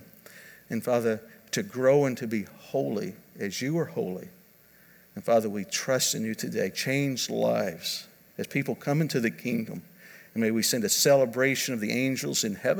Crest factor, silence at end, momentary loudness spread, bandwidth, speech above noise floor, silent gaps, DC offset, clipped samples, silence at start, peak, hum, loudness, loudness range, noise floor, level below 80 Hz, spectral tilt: 18 dB; 0 s; 14 LU; over 20 kHz; 30 dB; none; under 0.1%; under 0.1%; 0 s; -10 dBFS; none; -27 LUFS; 5 LU; -57 dBFS; -74 dBFS; -4 dB/octave